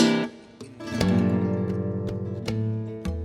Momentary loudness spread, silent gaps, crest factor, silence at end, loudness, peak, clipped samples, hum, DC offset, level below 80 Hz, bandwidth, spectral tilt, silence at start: 13 LU; none; 18 dB; 0 s; -27 LUFS; -6 dBFS; under 0.1%; none; under 0.1%; -44 dBFS; 14 kHz; -6.5 dB/octave; 0 s